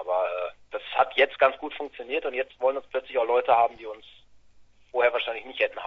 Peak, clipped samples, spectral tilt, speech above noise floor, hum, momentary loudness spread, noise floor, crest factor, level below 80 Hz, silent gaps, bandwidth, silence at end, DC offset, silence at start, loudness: -6 dBFS; under 0.1%; -4.5 dB/octave; 28 dB; none; 14 LU; -54 dBFS; 22 dB; -66 dBFS; none; 5.8 kHz; 0 s; under 0.1%; 0 s; -26 LUFS